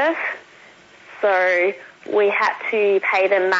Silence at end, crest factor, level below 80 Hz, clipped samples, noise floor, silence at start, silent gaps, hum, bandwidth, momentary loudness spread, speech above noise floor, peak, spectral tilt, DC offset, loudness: 0 s; 14 dB; -74 dBFS; under 0.1%; -47 dBFS; 0 s; none; none; 7.8 kHz; 9 LU; 29 dB; -6 dBFS; -4 dB/octave; under 0.1%; -19 LUFS